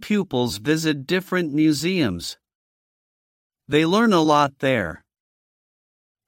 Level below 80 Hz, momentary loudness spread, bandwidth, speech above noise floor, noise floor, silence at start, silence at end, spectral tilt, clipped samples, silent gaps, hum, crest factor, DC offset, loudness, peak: -56 dBFS; 7 LU; 16.5 kHz; over 70 dB; under -90 dBFS; 0 s; 1.3 s; -5 dB/octave; under 0.1%; 2.55-3.50 s; none; 18 dB; under 0.1%; -21 LUFS; -4 dBFS